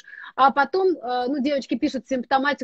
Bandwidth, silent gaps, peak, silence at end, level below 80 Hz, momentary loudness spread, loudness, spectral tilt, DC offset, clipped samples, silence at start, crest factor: 8 kHz; none; -2 dBFS; 0 s; -62 dBFS; 7 LU; -22 LUFS; -4.5 dB/octave; under 0.1%; under 0.1%; 0.1 s; 20 dB